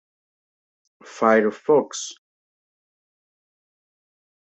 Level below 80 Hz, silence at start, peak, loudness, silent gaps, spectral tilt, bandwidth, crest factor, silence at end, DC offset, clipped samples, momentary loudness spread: -74 dBFS; 1.05 s; -4 dBFS; -20 LUFS; none; -4 dB/octave; 8.2 kHz; 22 dB; 2.35 s; under 0.1%; under 0.1%; 14 LU